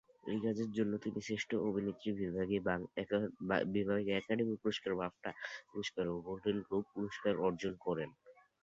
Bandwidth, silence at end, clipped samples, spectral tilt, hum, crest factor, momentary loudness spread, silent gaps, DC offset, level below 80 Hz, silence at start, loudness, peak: 7.6 kHz; 0.3 s; under 0.1%; -5 dB/octave; none; 20 dB; 7 LU; none; under 0.1%; -68 dBFS; 0.25 s; -38 LUFS; -18 dBFS